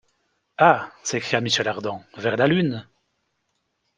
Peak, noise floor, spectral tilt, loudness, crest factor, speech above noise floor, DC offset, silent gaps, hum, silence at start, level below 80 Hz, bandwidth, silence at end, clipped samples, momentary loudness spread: -2 dBFS; -74 dBFS; -4.5 dB/octave; -22 LUFS; 22 dB; 52 dB; under 0.1%; none; none; 0.6 s; -62 dBFS; 10 kHz; 1.15 s; under 0.1%; 13 LU